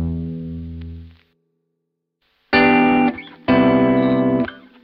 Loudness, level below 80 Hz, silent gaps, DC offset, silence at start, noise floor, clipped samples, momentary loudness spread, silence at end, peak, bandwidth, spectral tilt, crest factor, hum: -17 LUFS; -42 dBFS; none; under 0.1%; 0 s; -75 dBFS; under 0.1%; 18 LU; 0.25 s; -2 dBFS; 5.2 kHz; -9.5 dB/octave; 16 dB; none